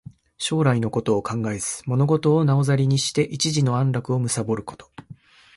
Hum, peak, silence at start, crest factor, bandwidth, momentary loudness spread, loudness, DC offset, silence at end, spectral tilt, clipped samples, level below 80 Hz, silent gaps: none; -8 dBFS; 0.4 s; 14 dB; 11.5 kHz; 8 LU; -22 LUFS; under 0.1%; 0.45 s; -5.5 dB/octave; under 0.1%; -56 dBFS; none